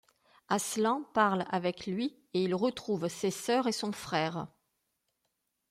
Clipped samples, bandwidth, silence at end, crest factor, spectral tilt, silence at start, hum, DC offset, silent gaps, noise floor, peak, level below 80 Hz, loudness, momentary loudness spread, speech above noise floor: under 0.1%; 16 kHz; 1.25 s; 20 dB; -4.5 dB/octave; 0.5 s; none; under 0.1%; none; -82 dBFS; -14 dBFS; -72 dBFS; -32 LUFS; 7 LU; 50 dB